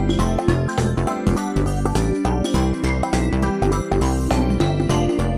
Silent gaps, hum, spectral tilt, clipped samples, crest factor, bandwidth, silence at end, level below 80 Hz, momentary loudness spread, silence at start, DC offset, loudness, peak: none; none; -6.5 dB/octave; under 0.1%; 16 dB; 14 kHz; 0 s; -26 dBFS; 2 LU; 0 s; under 0.1%; -20 LUFS; -2 dBFS